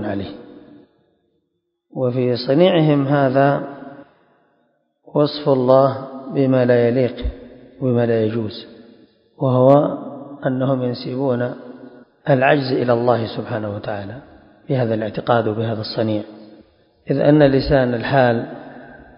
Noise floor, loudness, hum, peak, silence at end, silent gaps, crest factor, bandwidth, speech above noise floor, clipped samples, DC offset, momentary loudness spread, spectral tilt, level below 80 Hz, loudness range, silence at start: -73 dBFS; -18 LUFS; none; 0 dBFS; 0.2 s; none; 18 dB; 5.4 kHz; 56 dB; under 0.1%; under 0.1%; 19 LU; -10.5 dB/octave; -42 dBFS; 3 LU; 0 s